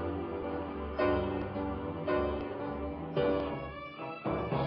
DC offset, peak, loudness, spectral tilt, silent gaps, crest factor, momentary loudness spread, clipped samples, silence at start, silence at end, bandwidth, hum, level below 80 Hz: under 0.1%; -18 dBFS; -35 LUFS; -10 dB/octave; none; 16 dB; 8 LU; under 0.1%; 0 s; 0 s; 5.6 kHz; none; -48 dBFS